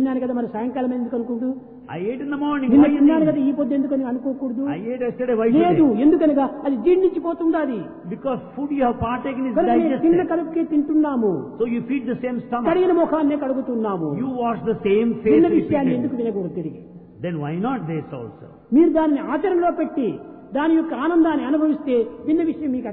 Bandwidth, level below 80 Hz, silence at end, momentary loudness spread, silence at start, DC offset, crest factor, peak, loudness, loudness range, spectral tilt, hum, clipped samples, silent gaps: 4 kHz; -52 dBFS; 0 s; 11 LU; 0 s; under 0.1%; 16 dB; -4 dBFS; -20 LUFS; 3 LU; -11.5 dB/octave; none; under 0.1%; none